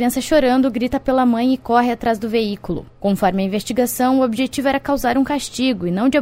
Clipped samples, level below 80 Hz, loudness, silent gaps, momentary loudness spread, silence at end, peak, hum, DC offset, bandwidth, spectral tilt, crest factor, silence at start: under 0.1%; -42 dBFS; -18 LUFS; none; 5 LU; 0 s; -2 dBFS; none; under 0.1%; 16 kHz; -5 dB/octave; 16 dB; 0 s